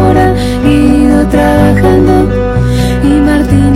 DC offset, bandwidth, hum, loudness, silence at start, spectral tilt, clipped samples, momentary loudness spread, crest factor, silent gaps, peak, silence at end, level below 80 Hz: under 0.1%; 14.5 kHz; none; -8 LUFS; 0 s; -7.5 dB/octave; 0.4%; 4 LU; 6 dB; none; 0 dBFS; 0 s; -16 dBFS